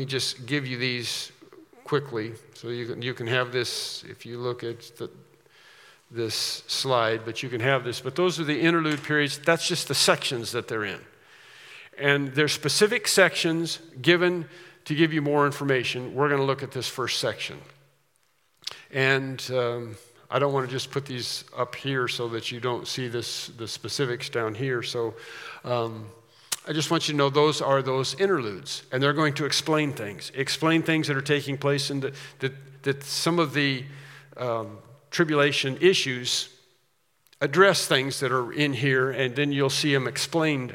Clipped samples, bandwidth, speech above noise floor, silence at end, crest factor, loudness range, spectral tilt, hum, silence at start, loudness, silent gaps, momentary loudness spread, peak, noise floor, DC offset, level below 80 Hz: under 0.1%; 17 kHz; 44 dB; 0 s; 24 dB; 7 LU; -4 dB/octave; none; 0 s; -25 LUFS; none; 13 LU; -2 dBFS; -70 dBFS; under 0.1%; -76 dBFS